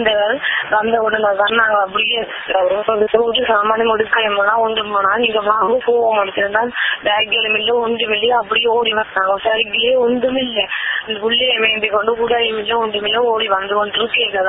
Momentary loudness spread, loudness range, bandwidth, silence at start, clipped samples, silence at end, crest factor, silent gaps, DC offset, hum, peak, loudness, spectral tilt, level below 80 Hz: 3 LU; 1 LU; 4 kHz; 0 s; under 0.1%; 0 s; 16 dB; none; under 0.1%; none; 0 dBFS; -15 LUFS; -8 dB/octave; -52 dBFS